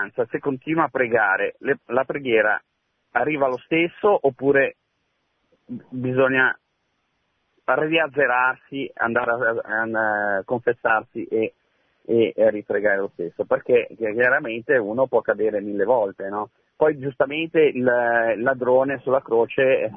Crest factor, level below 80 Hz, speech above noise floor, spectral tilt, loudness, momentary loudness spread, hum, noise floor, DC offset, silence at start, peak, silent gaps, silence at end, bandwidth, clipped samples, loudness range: 18 dB; -64 dBFS; 51 dB; -9 dB/octave; -21 LUFS; 8 LU; none; -72 dBFS; under 0.1%; 0 s; -4 dBFS; none; 0 s; 3.7 kHz; under 0.1%; 2 LU